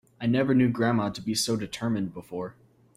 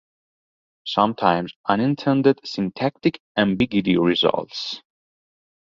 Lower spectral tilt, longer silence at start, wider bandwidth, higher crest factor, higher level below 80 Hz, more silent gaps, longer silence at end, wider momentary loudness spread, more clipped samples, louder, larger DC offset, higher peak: second, -5 dB/octave vs -6.5 dB/octave; second, 0.2 s vs 0.85 s; first, 15.5 kHz vs 7.4 kHz; about the same, 16 dB vs 20 dB; about the same, -60 dBFS vs -56 dBFS; second, none vs 1.56-1.64 s, 3.20-3.35 s; second, 0.45 s vs 0.9 s; first, 14 LU vs 10 LU; neither; second, -27 LUFS vs -21 LUFS; neither; second, -12 dBFS vs -2 dBFS